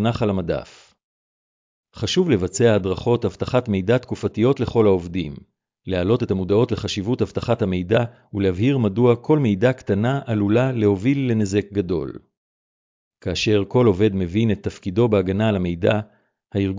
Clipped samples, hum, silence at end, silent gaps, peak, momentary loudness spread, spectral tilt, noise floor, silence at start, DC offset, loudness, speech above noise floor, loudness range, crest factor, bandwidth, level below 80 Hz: under 0.1%; none; 0 s; 1.04-1.83 s, 12.37-13.11 s; -4 dBFS; 9 LU; -7 dB/octave; under -90 dBFS; 0 s; under 0.1%; -20 LUFS; over 70 dB; 3 LU; 16 dB; 7.6 kHz; -42 dBFS